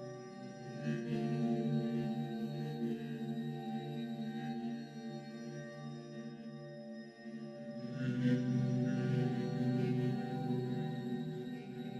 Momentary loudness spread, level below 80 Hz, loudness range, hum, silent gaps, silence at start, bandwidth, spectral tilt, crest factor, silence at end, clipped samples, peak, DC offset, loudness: 13 LU; -76 dBFS; 10 LU; none; none; 0 s; 8.2 kHz; -8 dB/octave; 16 dB; 0 s; under 0.1%; -22 dBFS; under 0.1%; -39 LUFS